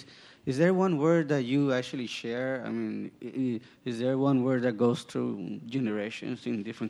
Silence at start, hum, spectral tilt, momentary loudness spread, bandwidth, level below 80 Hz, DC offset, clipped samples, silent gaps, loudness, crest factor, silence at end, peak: 0 s; none; -7 dB/octave; 11 LU; 11.5 kHz; -74 dBFS; under 0.1%; under 0.1%; none; -29 LUFS; 18 dB; 0 s; -12 dBFS